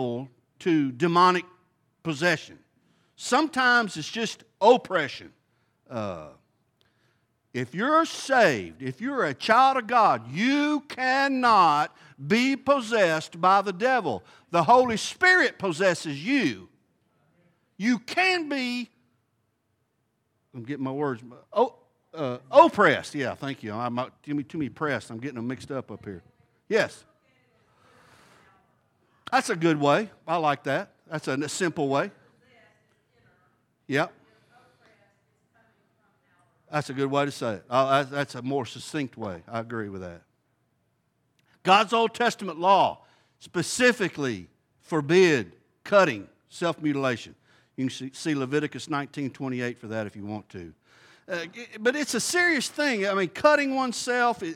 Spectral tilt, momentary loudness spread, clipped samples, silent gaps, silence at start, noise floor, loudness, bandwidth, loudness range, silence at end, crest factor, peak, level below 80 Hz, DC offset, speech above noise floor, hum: -4.5 dB/octave; 16 LU; under 0.1%; none; 0 s; -74 dBFS; -25 LUFS; 16 kHz; 11 LU; 0 s; 22 dB; -4 dBFS; -74 dBFS; under 0.1%; 49 dB; none